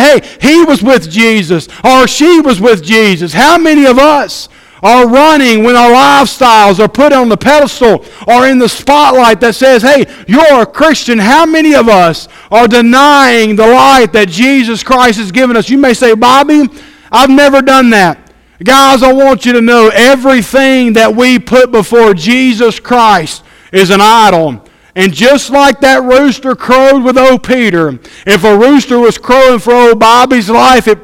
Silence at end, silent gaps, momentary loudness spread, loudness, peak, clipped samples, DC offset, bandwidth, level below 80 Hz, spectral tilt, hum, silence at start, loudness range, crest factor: 0.05 s; none; 6 LU; -5 LUFS; 0 dBFS; 7%; under 0.1%; 17 kHz; -36 dBFS; -4 dB/octave; none; 0 s; 2 LU; 6 dB